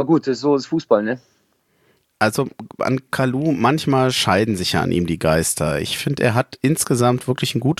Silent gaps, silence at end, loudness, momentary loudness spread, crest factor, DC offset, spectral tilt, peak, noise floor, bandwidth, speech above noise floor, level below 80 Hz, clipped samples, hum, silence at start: none; 0.05 s; -19 LUFS; 5 LU; 18 dB; under 0.1%; -5 dB/octave; -2 dBFS; -63 dBFS; 15 kHz; 44 dB; -46 dBFS; under 0.1%; none; 0 s